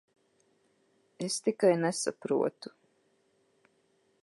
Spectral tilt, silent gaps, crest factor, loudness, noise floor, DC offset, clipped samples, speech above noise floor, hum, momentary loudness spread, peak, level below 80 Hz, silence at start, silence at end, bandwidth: -4.5 dB/octave; none; 22 dB; -30 LUFS; -71 dBFS; under 0.1%; under 0.1%; 42 dB; none; 16 LU; -12 dBFS; -86 dBFS; 1.2 s; 1.55 s; 11.5 kHz